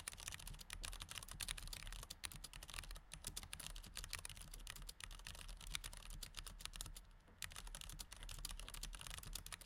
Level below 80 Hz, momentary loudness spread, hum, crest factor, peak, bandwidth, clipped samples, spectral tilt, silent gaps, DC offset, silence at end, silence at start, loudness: -56 dBFS; 5 LU; none; 32 dB; -22 dBFS; 17 kHz; under 0.1%; -1 dB/octave; none; under 0.1%; 0 s; 0 s; -52 LUFS